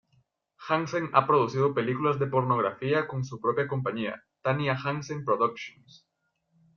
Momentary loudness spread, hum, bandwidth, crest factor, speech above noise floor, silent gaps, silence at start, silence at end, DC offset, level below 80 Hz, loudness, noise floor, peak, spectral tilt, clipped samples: 9 LU; none; 7 kHz; 24 dB; 49 dB; none; 0.6 s; 1.05 s; under 0.1%; -68 dBFS; -27 LUFS; -76 dBFS; -6 dBFS; -7 dB/octave; under 0.1%